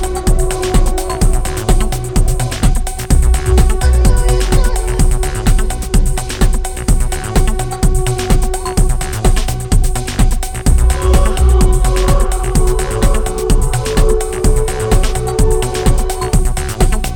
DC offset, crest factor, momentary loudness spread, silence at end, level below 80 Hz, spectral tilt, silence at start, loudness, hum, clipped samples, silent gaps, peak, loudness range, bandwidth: under 0.1%; 12 dB; 5 LU; 0 s; -12 dBFS; -5 dB/octave; 0 s; -15 LUFS; none; under 0.1%; none; 0 dBFS; 2 LU; 17.5 kHz